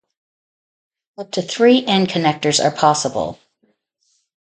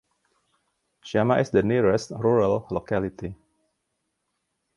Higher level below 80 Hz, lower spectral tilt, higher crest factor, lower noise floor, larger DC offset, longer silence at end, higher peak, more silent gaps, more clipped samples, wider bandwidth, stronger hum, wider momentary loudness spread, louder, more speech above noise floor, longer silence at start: about the same, -58 dBFS vs -54 dBFS; second, -4 dB/octave vs -7 dB/octave; about the same, 20 dB vs 20 dB; second, -66 dBFS vs -78 dBFS; neither; second, 1.15 s vs 1.4 s; first, 0 dBFS vs -6 dBFS; neither; neither; second, 9.4 kHz vs 11.5 kHz; neither; about the same, 12 LU vs 10 LU; first, -17 LUFS vs -23 LUFS; second, 50 dB vs 55 dB; first, 1.2 s vs 1.05 s